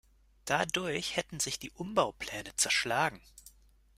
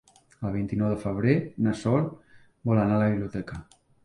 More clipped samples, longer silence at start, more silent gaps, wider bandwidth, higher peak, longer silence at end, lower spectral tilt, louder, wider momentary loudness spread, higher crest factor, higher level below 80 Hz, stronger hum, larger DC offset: neither; about the same, 0.45 s vs 0.4 s; neither; first, 16 kHz vs 11 kHz; about the same, -12 dBFS vs -10 dBFS; about the same, 0.5 s vs 0.4 s; second, -2 dB/octave vs -8.5 dB/octave; second, -32 LUFS vs -27 LUFS; about the same, 11 LU vs 12 LU; about the same, 22 dB vs 18 dB; second, -62 dBFS vs -52 dBFS; neither; neither